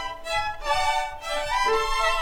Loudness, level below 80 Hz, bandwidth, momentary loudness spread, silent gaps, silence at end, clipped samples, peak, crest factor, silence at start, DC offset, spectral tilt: -25 LUFS; -38 dBFS; 18 kHz; 6 LU; none; 0 s; under 0.1%; -10 dBFS; 14 dB; 0 s; under 0.1%; -1 dB/octave